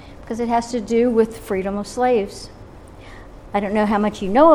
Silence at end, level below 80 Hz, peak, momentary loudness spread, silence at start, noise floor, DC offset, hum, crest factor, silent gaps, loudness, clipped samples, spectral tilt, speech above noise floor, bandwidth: 0 s; -42 dBFS; -2 dBFS; 21 LU; 0 s; -40 dBFS; under 0.1%; none; 16 dB; none; -20 LUFS; under 0.1%; -6 dB/octave; 22 dB; 14.5 kHz